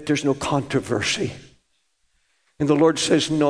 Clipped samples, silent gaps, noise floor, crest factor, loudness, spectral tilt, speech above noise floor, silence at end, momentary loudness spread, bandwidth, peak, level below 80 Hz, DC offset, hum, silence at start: under 0.1%; none; -70 dBFS; 18 dB; -21 LUFS; -4.5 dB/octave; 49 dB; 0 s; 9 LU; 11 kHz; -4 dBFS; -54 dBFS; under 0.1%; none; 0 s